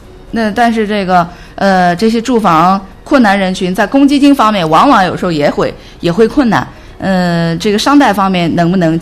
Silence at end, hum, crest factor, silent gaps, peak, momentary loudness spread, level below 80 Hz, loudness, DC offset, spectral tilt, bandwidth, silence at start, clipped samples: 0 s; none; 10 dB; none; 0 dBFS; 8 LU; -36 dBFS; -10 LUFS; under 0.1%; -6 dB/octave; 14.5 kHz; 0.05 s; 0.7%